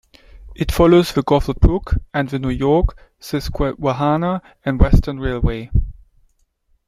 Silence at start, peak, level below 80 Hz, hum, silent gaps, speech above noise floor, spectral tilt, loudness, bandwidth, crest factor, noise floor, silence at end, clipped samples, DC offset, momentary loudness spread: 0.35 s; -2 dBFS; -24 dBFS; none; none; 45 dB; -7.5 dB/octave; -18 LUFS; 15.5 kHz; 16 dB; -61 dBFS; 0.95 s; under 0.1%; under 0.1%; 11 LU